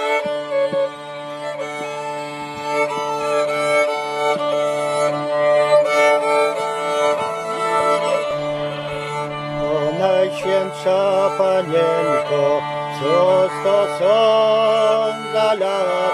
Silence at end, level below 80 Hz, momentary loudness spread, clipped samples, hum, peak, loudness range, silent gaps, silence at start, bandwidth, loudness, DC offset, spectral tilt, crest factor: 0 s; -56 dBFS; 10 LU; under 0.1%; none; -4 dBFS; 5 LU; none; 0 s; 13 kHz; -18 LUFS; under 0.1%; -4.5 dB/octave; 14 dB